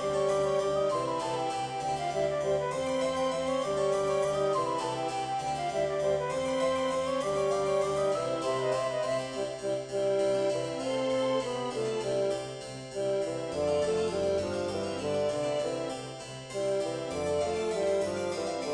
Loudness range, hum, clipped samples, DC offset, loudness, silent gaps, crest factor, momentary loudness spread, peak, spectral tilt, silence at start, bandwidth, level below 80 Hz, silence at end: 2 LU; none; under 0.1%; under 0.1%; -31 LUFS; none; 14 dB; 5 LU; -18 dBFS; -4.5 dB/octave; 0 s; 10 kHz; -60 dBFS; 0 s